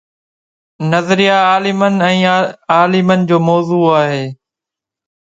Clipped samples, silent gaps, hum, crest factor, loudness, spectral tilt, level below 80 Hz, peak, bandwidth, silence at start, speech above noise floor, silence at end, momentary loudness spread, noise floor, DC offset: under 0.1%; none; none; 14 dB; -12 LUFS; -6 dB/octave; -58 dBFS; 0 dBFS; 7.8 kHz; 0.8 s; 73 dB; 0.9 s; 6 LU; -85 dBFS; under 0.1%